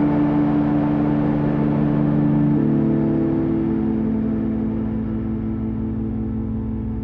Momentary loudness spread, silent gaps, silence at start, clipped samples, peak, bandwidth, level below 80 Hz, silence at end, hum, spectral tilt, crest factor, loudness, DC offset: 7 LU; none; 0 s; under 0.1%; -6 dBFS; 4.3 kHz; -36 dBFS; 0 s; none; -11.5 dB/octave; 12 dB; -20 LUFS; under 0.1%